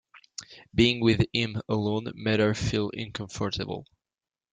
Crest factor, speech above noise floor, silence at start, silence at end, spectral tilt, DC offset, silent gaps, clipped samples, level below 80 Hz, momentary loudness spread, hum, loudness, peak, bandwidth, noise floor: 20 dB; over 64 dB; 0.15 s; 0.7 s; -5.5 dB/octave; under 0.1%; none; under 0.1%; -50 dBFS; 17 LU; none; -27 LUFS; -8 dBFS; 9.4 kHz; under -90 dBFS